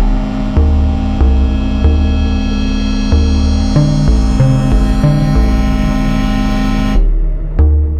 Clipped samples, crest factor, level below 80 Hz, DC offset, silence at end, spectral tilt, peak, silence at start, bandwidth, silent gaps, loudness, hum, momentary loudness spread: under 0.1%; 10 dB; -12 dBFS; under 0.1%; 0 s; -7.5 dB/octave; 0 dBFS; 0 s; 9 kHz; none; -13 LUFS; none; 4 LU